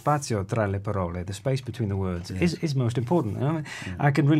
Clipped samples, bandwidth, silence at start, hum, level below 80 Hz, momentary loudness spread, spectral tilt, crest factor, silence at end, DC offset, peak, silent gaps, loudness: under 0.1%; 13.5 kHz; 0.05 s; none; -52 dBFS; 6 LU; -7 dB/octave; 16 dB; 0 s; under 0.1%; -8 dBFS; none; -27 LUFS